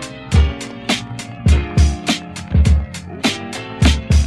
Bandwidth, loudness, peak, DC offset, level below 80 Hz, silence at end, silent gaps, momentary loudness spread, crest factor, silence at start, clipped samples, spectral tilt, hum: 12 kHz; -18 LUFS; -2 dBFS; under 0.1%; -18 dBFS; 0 s; none; 11 LU; 16 dB; 0 s; under 0.1%; -5 dB/octave; none